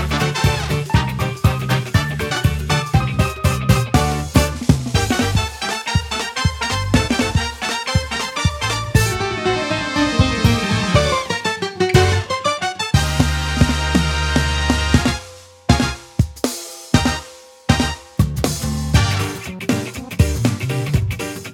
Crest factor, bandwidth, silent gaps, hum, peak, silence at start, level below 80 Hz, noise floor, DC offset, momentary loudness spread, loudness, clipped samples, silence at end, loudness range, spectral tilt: 18 dB; 18 kHz; none; none; 0 dBFS; 0 s; -28 dBFS; -39 dBFS; under 0.1%; 6 LU; -18 LUFS; under 0.1%; 0 s; 3 LU; -5 dB/octave